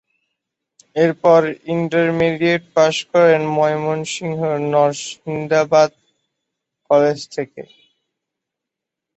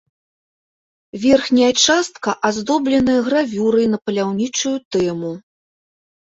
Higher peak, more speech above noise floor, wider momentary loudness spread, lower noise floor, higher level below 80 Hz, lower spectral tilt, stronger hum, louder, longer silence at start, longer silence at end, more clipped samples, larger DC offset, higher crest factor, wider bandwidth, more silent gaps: about the same, -2 dBFS vs -2 dBFS; second, 67 dB vs over 73 dB; first, 12 LU vs 9 LU; second, -83 dBFS vs under -90 dBFS; second, -60 dBFS vs -54 dBFS; first, -5.5 dB/octave vs -3.5 dB/octave; neither; about the same, -17 LUFS vs -17 LUFS; second, 0.95 s vs 1.15 s; first, 1.5 s vs 0.85 s; neither; neither; about the same, 16 dB vs 16 dB; about the same, 8.2 kHz vs 8 kHz; second, none vs 4.85-4.91 s